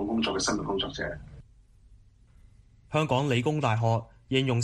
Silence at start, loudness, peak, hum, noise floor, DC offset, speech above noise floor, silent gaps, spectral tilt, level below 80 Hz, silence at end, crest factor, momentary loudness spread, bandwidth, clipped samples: 0 s; -28 LUFS; -10 dBFS; none; -56 dBFS; under 0.1%; 29 dB; none; -5 dB/octave; -52 dBFS; 0 s; 18 dB; 7 LU; 11 kHz; under 0.1%